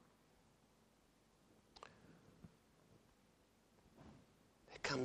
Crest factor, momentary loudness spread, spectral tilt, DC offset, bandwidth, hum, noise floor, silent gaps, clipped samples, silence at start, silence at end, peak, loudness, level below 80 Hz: 28 dB; 20 LU; -4 dB/octave; under 0.1%; 15 kHz; none; -74 dBFS; none; under 0.1%; 1.75 s; 0 s; -26 dBFS; -53 LUFS; -78 dBFS